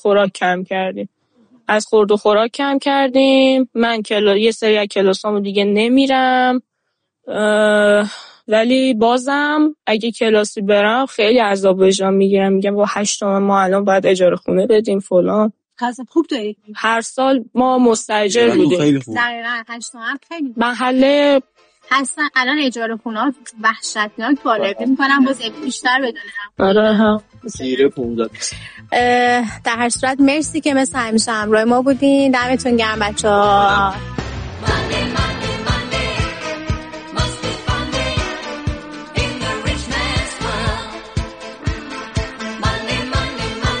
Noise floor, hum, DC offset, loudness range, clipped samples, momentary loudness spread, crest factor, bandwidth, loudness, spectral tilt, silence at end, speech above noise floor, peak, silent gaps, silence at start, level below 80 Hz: -73 dBFS; none; under 0.1%; 7 LU; under 0.1%; 11 LU; 12 dB; 10 kHz; -16 LUFS; -4.5 dB/octave; 0 s; 58 dB; -4 dBFS; none; 0.05 s; -36 dBFS